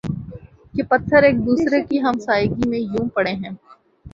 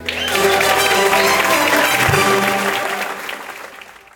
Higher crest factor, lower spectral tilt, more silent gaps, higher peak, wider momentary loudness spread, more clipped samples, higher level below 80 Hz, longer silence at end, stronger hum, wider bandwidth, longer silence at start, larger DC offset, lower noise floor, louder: about the same, 18 dB vs 16 dB; first, -7 dB/octave vs -2.5 dB/octave; neither; about the same, -2 dBFS vs 0 dBFS; about the same, 16 LU vs 15 LU; neither; about the same, -44 dBFS vs -44 dBFS; second, 0.05 s vs 0.25 s; neither; second, 7.6 kHz vs 19 kHz; about the same, 0.05 s vs 0 s; neither; about the same, -39 dBFS vs -38 dBFS; second, -19 LUFS vs -14 LUFS